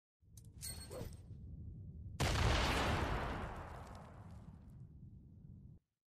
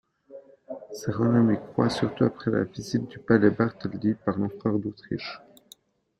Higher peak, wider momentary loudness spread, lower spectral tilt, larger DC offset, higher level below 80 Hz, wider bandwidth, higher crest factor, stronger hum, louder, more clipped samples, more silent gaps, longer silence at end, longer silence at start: second, -24 dBFS vs -6 dBFS; first, 24 LU vs 13 LU; second, -4.5 dB/octave vs -7 dB/octave; neither; first, -48 dBFS vs -60 dBFS; first, 15 kHz vs 13 kHz; about the same, 18 dB vs 20 dB; neither; second, -40 LUFS vs -26 LUFS; neither; neither; second, 0.4 s vs 0.8 s; about the same, 0.3 s vs 0.3 s